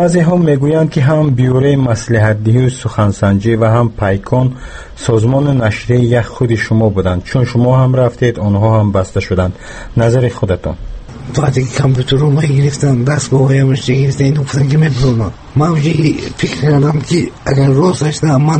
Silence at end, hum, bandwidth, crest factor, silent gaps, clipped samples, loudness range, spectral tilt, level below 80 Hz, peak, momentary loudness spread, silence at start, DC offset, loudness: 0 s; none; 8.8 kHz; 12 dB; none; under 0.1%; 2 LU; -7 dB/octave; -32 dBFS; 0 dBFS; 6 LU; 0 s; under 0.1%; -12 LUFS